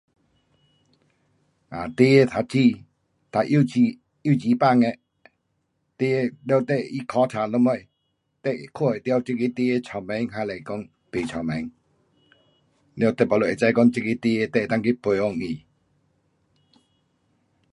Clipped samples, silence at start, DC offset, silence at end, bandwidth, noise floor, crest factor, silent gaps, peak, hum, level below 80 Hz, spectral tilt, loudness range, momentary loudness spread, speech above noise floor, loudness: under 0.1%; 1.7 s; under 0.1%; 2.15 s; 11 kHz; -74 dBFS; 20 dB; none; -4 dBFS; none; -60 dBFS; -7.5 dB/octave; 6 LU; 13 LU; 52 dB; -23 LUFS